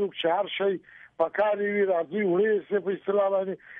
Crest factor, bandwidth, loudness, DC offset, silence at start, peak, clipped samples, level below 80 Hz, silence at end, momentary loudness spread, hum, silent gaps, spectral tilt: 14 dB; 3.8 kHz; -26 LUFS; under 0.1%; 0 s; -12 dBFS; under 0.1%; -76 dBFS; 0 s; 4 LU; none; none; -8.5 dB/octave